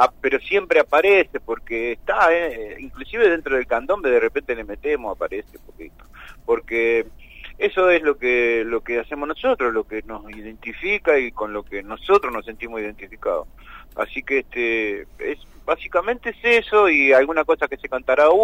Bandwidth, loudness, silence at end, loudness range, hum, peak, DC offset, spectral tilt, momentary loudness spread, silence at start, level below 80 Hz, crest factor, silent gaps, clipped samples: 16 kHz; -20 LUFS; 0 s; 6 LU; none; -4 dBFS; under 0.1%; -5 dB/octave; 16 LU; 0 s; -46 dBFS; 16 dB; none; under 0.1%